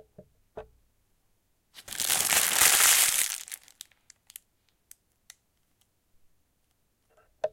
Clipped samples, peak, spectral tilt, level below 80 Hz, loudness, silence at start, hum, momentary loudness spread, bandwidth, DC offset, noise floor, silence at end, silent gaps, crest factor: under 0.1%; -4 dBFS; 2 dB/octave; -64 dBFS; -21 LUFS; 0.55 s; none; 21 LU; 17 kHz; under 0.1%; -73 dBFS; 0.05 s; none; 26 dB